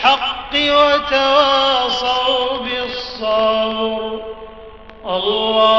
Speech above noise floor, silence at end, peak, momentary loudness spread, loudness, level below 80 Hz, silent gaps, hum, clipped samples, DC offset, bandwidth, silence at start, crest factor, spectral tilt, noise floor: 23 dB; 0 s; 0 dBFS; 13 LU; -16 LUFS; -44 dBFS; none; none; under 0.1%; 0.3%; 7.6 kHz; 0 s; 16 dB; 0.5 dB/octave; -37 dBFS